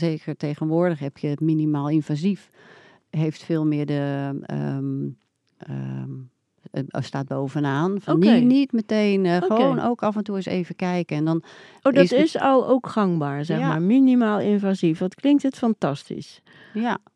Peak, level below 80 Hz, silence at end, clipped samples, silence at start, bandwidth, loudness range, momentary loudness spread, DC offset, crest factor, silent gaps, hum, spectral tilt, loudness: 0 dBFS; -72 dBFS; 0.2 s; under 0.1%; 0 s; 10.5 kHz; 9 LU; 14 LU; under 0.1%; 22 dB; none; none; -8 dB/octave; -22 LUFS